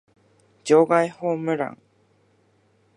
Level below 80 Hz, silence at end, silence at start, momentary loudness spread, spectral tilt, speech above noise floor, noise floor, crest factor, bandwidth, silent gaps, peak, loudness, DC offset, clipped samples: -76 dBFS; 1.25 s; 0.65 s; 13 LU; -6 dB/octave; 42 dB; -62 dBFS; 20 dB; 11 kHz; none; -4 dBFS; -21 LUFS; under 0.1%; under 0.1%